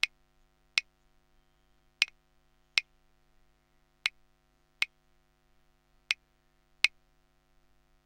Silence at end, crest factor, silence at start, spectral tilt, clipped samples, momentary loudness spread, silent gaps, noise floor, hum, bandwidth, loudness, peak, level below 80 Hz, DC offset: 1.2 s; 34 dB; 0.05 s; 2.5 dB/octave; under 0.1%; 6 LU; none; -70 dBFS; none; 16 kHz; -32 LUFS; -6 dBFS; -70 dBFS; under 0.1%